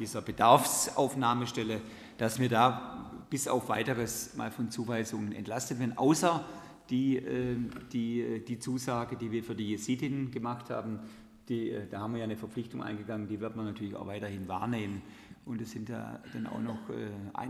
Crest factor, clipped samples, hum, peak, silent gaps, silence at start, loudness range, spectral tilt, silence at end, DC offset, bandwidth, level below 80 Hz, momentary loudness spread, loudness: 26 dB; under 0.1%; none; -6 dBFS; none; 0 s; 7 LU; -5 dB/octave; 0 s; under 0.1%; 15 kHz; -64 dBFS; 13 LU; -33 LUFS